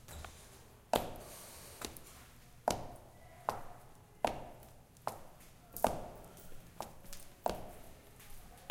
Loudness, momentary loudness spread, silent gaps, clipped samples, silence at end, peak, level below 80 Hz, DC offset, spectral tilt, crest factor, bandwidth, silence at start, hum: -42 LUFS; 20 LU; none; under 0.1%; 0 s; -10 dBFS; -58 dBFS; under 0.1%; -4 dB/octave; 34 dB; 16.5 kHz; 0 s; none